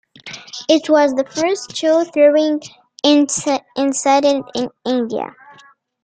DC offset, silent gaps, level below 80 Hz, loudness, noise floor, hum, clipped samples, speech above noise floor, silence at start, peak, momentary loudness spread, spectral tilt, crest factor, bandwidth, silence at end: under 0.1%; none; -64 dBFS; -16 LUFS; -48 dBFS; none; under 0.1%; 32 dB; 0.25 s; -2 dBFS; 13 LU; -2.5 dB/octave; 16 dB; 9.4 kHz; 0.75 s